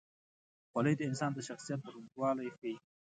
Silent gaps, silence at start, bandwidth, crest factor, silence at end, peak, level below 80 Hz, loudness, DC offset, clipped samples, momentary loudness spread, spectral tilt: 2.58-2.62 s; 0.75 s; 9.4 kHz; 20 dB; 0.35 s; -18 dBFS; -80 dBFS; -37 LUFS; under 0.1%; under 0.1%; 11 LU; -6 dB/octave